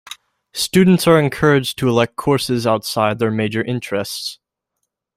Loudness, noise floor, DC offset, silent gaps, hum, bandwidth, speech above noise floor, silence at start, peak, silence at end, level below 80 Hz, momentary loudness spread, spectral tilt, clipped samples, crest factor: -17 LUFS; -76 dBFS; under 0.1%; none; none; 16 kHz; 60 dB; 0.05 s; -2 dBFS; 0.85 s; -50 dBFS; 13 LU; -5.5 dB/octave; under 0.1%; 16 dB